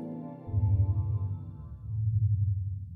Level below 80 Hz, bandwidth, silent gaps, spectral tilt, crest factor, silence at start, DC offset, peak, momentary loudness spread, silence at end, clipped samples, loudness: -42 dBFS; 1.4 kHz; none; -13.5 dB/octave; 14 dB; 0 s; under 0.1%; -16 dBFS; 13 LU; 0 s; under 0.1%; -31 LUFS